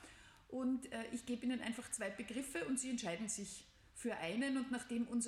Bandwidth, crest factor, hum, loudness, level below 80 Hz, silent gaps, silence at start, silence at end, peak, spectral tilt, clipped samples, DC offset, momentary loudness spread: 14.5 kHz; 14 dB; none; -42 LUFS; -72 dBFS; none; 0 s; 0 s; -28 dBFS; -3 dB/octave; under 0.1%; under 0.1%; 10 LU